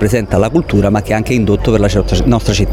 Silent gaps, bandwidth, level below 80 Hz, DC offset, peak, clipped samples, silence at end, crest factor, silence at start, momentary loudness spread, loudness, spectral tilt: none; 15.5 kHz; -22 dBFS; under 0.1%; 0 dBFS; under 0.1%; 0 s; 12 dB; 0 s; 1 LU; -13 LUFS; -6.5 dB/octave